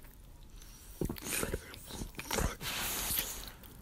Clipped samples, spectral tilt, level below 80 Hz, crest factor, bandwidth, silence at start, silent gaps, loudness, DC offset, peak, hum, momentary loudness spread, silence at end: under 0.1%; -2.5 dB/octave; -48 dBFS; 28 dB; 16.5 kHz; 0 s; none; -37 LUFS; under 0.1%; -12 dBFS; none; 21 LU; 0 s